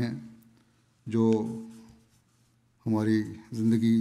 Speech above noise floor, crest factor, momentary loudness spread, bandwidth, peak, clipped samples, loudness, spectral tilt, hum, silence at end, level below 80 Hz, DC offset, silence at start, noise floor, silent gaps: 40 dB; 16 dB; 20 LU; 12 kHz; -12 dBFS; under 0.1%; -28 LUFS; -8 dB/octave; none; 0 s; -70 dBFS; under 0.1%; 0 s; -66 dBFS; none